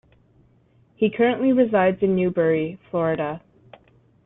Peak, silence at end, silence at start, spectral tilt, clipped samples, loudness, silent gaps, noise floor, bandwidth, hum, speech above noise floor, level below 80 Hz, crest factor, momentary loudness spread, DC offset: -6 dBFS; 0.9 s; 1 s; -11 dB/octave; under 0.1%; -21 LUFS; none; -58 dBFS; 3.9 kHz; none; 38 dB; -58 dBFS; 18 dB; 9 LU; under 0.1%